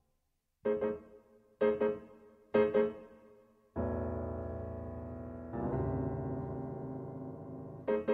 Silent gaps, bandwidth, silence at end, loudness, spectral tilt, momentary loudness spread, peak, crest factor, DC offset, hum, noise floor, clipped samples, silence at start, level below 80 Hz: none; 4.6 kHz; 0 s; -37 LUFS; -10 dB/octave; 14 LU; -16 dBFS; 20 dB; under 0.1%; none; -80 dBFS; under 0.1%; 0.65 s; -52 dBFS